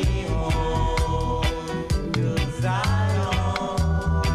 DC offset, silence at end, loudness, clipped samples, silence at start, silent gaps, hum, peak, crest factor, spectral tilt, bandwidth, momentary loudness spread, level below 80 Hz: under 0.1%; 0 s; -24 LUFS; under 0.1%; 0 s; none; none; -8 dBFS; 14 dB; -6 dB/octave; 14.5 kHz; 3 LU; -28 dBFS